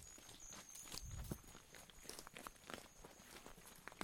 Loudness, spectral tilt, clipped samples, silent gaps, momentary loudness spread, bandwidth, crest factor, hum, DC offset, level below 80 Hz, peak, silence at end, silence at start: -55 LUFS; -3 dB/octave; under 0.1%; none; 8 LU; 17.5 kHz; 30 dB; none; under 0.1%; -64 dBFS; -26 dBFS; 0 s; 0 s